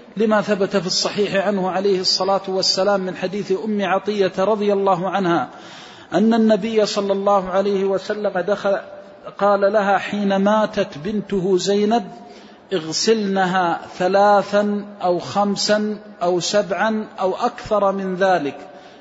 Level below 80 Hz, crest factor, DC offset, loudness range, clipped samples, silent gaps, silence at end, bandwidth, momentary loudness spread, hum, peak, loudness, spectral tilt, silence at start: -58 dBFS; 14 dB; under 0.1%; 2 LU; under 0.1%; none; 0.05 s; 8 kHz; 7 LU; none; -4 dBFS; -19 LUFS; -4.5 dB/octave; 0 s